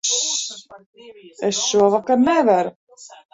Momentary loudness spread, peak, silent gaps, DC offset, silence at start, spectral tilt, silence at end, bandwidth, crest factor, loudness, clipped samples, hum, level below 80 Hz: 13 LU; -2 dBFS; 0.86-0.93 s, 2.76-2.87 s; under 0.1%; 0.05 s; -2.5 dB/octave; 0.25 s; 8.2 kHz; 18 dB; -18 LUFS; under 0.1%; none; -62 dBFS